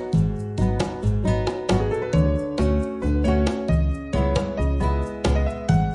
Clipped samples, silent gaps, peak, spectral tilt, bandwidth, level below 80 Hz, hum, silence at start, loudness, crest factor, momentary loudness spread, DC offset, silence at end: under 0.1%; none; -6 dBFS; -7.5 dB/octave; 11 kHz; -28 dBFS; none; 0 s; -23 LUFS; 16 dB; 3 LU; under 0.1%; 0 s